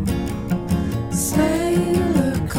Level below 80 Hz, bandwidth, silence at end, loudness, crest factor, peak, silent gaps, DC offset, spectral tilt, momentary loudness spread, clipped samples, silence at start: -32 dBFS; 17 kHz; 0 s; -20 LUFS; 14 dB; -6 dBFS; none; 0.3%; -6 dB/octave; 6 LU; under 0.1%; 0 s